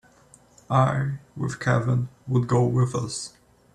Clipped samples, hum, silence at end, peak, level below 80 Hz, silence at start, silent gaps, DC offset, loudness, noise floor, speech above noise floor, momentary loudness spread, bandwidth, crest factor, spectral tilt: under 0.1%; none; 0.45 s; -8 dBFS; -56 dBFS; 0.7 s; none; under 0.1%; -24 LUFS; -55 dBFS; 32 dB; 10 LU; 10.5 kHz; 18 dB; -6.5 dB/octave